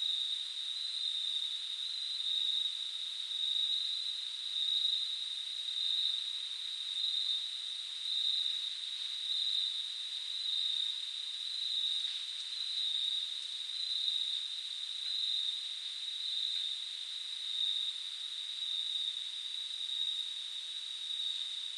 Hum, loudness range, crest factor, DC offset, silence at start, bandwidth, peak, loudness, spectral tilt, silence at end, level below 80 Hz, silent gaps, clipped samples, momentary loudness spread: none; 3 LU; 16 dB; under 0.1%; 0 s; 12.5 kHz; -22 dBFS; -34 LUFS; 5.5 dB/octave; 0 s; under -90 dBFS; none; under 0.1%; 7 LU